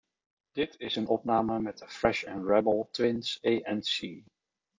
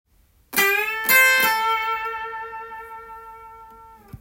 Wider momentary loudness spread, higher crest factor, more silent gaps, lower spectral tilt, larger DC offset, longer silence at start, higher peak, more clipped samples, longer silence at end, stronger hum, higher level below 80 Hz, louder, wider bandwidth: second, 8 LU vs 24 LU; about the same, 20 dB vs 20 dB; neither; first, -5 dB/octave vs 0 dB/octave; neither; about the same, 0.55 s vs 0.5 s; second, -12 dBFS vs -2 dBFS; neither; first, 0.55 s vs 0.05 s; neither; about the same, -60 dBFS vs -58 dBFS; second, -30 LUFS vs -18 LUFS; second, 7.6 kHz vs 17 kHz